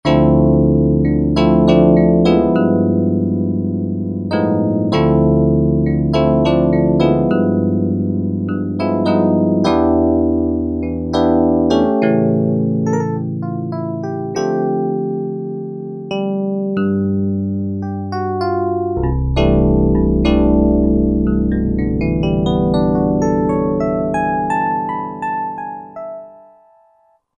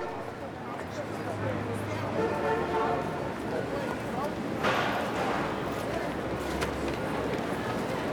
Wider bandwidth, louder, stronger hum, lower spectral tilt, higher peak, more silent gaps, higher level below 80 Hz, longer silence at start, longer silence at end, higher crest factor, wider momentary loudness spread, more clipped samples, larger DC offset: second, 7.4 kHz vs over 20 kHz; first, -16 LUFS vs -31 LUFS; neither; first, -8.5 dB/octave vs -5.5 dB/octave; first, 0 dBFS vs -14 dBFS; neither; first, -28 dBFS vs -50 dBFS; about the same, 0.05 s vs 0 s; first, 1.05 s vs 0 s; about the same, 14 dB vs 18 dB; about the same, 10 LU vs 8 LU; neither; neither